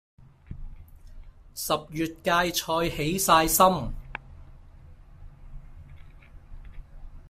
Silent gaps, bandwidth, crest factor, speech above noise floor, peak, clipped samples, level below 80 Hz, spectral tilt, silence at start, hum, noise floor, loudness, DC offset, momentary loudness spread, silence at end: none; 16 kHz; 24 dB; 24 dB; -4 dBFS; under 0.1%; -44 dBFS; -3.5 dB/octave; 0.5 s; none; -48 dBFS; -24 LUFS; under 0.1%; 24 LU; 0 s